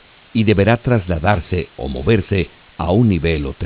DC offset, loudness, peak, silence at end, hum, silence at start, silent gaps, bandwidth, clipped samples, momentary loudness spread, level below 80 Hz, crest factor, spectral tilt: under 0.1%; -17 LUFS; 0 dBFS; 0 s; none; 0.35 s; none; 4 kHz; under 0.1%; 9 LU; -30 dBFS; 16 dB; -11.5 dB/octave